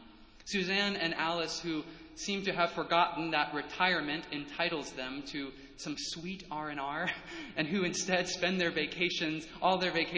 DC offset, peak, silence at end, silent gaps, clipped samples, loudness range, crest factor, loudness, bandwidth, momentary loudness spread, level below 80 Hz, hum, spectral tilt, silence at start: under 0.1%; -12 dBFS; 0 s; none; under 0.1%; 5 LU; 22 dB; -33 LUFS; 8 kHz; 11 LU; -62 dBFS; none; -3.5 dB/octave; 0 s